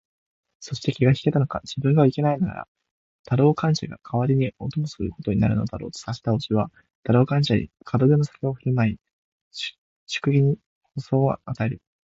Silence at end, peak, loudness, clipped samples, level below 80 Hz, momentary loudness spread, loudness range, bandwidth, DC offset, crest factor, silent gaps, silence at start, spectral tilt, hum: 0.4 s; -6 dBFS; -23 LUFS; under 0.1%; -50 dBFS; 13 LU; 3 LU; 7.8 kHz; under 0.1%; 18 dB; 2.68-2.75 s, 2.91-3.24 s, 6.95-7.03 s, 9.13-9.51 s, 9.78-10.07 s, 10.66-10.81 s; 0.6 s; -7.5 dB/octave; none